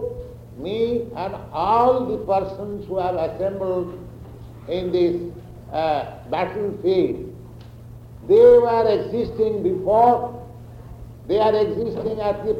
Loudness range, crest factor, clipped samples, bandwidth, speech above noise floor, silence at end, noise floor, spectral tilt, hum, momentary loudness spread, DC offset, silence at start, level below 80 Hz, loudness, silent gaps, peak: 7 LU; 18 dB; under 0.1%; 6.4 kHz; 20 dB; 0 s; -40 dBFS; -8 dB/octave; none; 24 LU; under 0.1%; 0 s; -46 dBFS; -20 LUFS; none; -4 dBFS